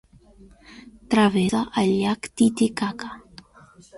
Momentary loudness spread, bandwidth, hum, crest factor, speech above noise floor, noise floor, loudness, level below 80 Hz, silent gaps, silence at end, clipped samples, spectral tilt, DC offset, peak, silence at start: 14 LU; 11.5 kHz; none; 18 dB; 30 dB; -51 dBFS; -22 LUFS; -54 dBFS; none; 0 s; under 0.1%; -5.5 dB/octave; under 0.1%; -6 dBFS; 0.7 s